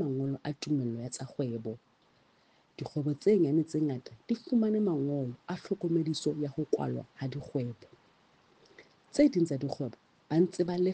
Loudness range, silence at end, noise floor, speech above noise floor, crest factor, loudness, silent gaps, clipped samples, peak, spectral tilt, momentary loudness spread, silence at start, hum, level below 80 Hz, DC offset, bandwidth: 5 LU; 0 s; -67 dBFS; 36 dB; 20 dB; -32 LUFS; none; under 0.1%; -12 dBFS; -7 dB/octave; 12 LU; 0 s; none; -70 dBFS; under 0.1%; 9.4 kHz